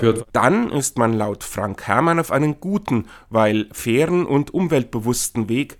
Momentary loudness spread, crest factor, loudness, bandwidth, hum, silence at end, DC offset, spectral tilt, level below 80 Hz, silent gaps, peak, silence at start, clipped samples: 7 LU; 20 dB; -20 LUFS; 19 kHz; none; 0.05 s; under 0.1%; -5.5 dB/octave; -48 dBFS; none; 0 dBFS; 0 s; under 0.1%